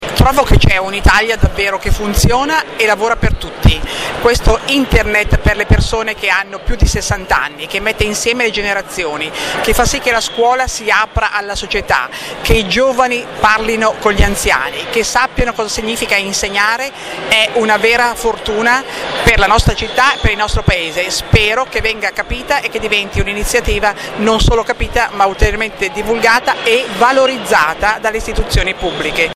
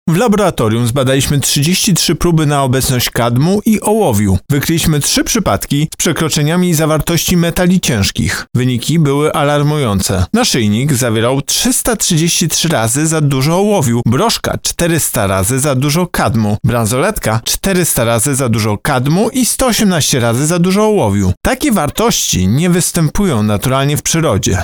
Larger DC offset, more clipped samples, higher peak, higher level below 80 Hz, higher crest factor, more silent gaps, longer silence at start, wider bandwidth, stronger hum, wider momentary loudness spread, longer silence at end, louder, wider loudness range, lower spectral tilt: neither; neither; about the same, 0 dBFS vs -2 dBFS; first, -20 dBFS vs -32 dBFS; about the same, 14 dB vs 10 dB; second, none vs 21.37-21.41 s; about the same, 0 s vs 0.05 s; second, 16 kHz vs over 20 kHz; neither; first, 6 LU vs 3 LU; about the same, 0 s vs 0 s; about the same, -13 LUFS vs -12 LUFS; about the same, 2 LU vs 1 LU; about the same, -4 dB/octave vs -4.5 dB/octave